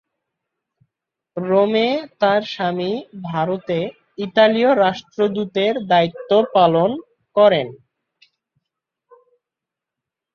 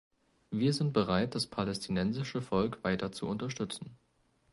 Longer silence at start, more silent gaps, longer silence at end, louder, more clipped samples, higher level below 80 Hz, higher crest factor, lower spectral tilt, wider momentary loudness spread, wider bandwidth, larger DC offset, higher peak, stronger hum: first, 1.35 s vs 0.5 s; neither; first, 2.6 s vs 0.55 s; first, -18 LUFS vs -33 LUFS; neither; second, -64 dBFS vs -58 dBFS; about the same, 18 dB vs 18 dB; about the same, -7 dB/octave vs -6 dB/octave; first, 13 LU vs 9 LU; second, 6.8 kHz vs 11.5 kHz; neither; first, -2 dBFS vs -16 dBFS; neither